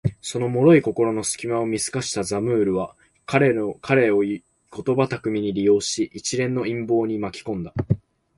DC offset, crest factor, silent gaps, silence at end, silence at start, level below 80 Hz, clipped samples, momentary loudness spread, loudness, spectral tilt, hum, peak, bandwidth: under 0.1%; 18 dB; none; 0.4 s; 0.05 s; -50 dBFS; under 0.1%; 10 LU; -22 LUFS; -5.5 dB/octave; none; -4 dBFS; 11.5 kHz